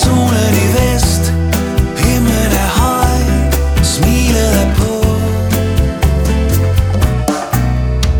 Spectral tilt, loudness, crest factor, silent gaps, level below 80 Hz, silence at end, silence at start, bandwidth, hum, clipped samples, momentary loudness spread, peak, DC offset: -5.5 dB/octave; -13 LUFS; 10 dB; none; -16 dBFS; 0 s; 0 s; 20 kHz; none; under 0.1%; 3 LU; 0 dBFS; under 0.1%